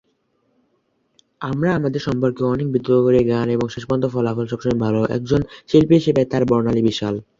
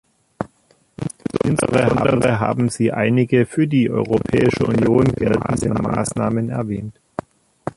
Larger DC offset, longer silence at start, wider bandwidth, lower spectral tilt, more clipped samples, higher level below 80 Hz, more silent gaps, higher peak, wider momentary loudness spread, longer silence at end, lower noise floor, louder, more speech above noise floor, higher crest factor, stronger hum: neither; first, 1.4 s vs 0.4 s; second, 7.6 kHz vs 11.5 kHz; about the same, -7.5 dB/octave vs -6.5 dB/octave; neither; about the same, -46 dBFS vs -44 dBFS; neither; about the same, -2 dBFS vs -2 dBFS; second, 7 LU vs 15 LU; about the same, 0.15 s vs 0.05 s; first, -66 dBFS vs -58 dBFS; about the same, -19 LUFS vs -18 LUFS; first, 48 dB vs 41 dB; about the same, 18 dB vs 16 dB; neither